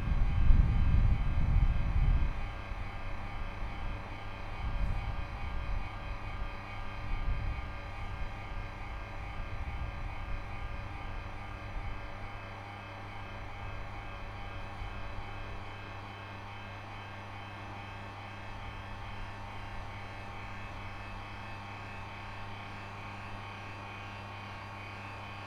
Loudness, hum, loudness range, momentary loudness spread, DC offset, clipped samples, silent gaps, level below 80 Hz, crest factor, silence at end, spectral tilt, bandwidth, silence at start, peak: -39 LUFS; none; 8 LU; 12 LU; under 0.1%; under 0.1%; none; -36 dBFS; 26 dB; 0 s; -6.5 dB/octave; 6.8 kHz; 0 s; -10 dBFS